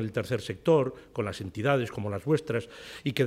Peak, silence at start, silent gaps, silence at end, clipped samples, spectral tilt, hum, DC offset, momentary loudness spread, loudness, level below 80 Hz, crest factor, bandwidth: -10 dBFS; 0 s; none; 0 s; under 0.1%; -6.5 dB/octave; none; under 0.1%; 9 LU; -29 LUFS; -60 dBFS; 18 dB; 15.5 kHz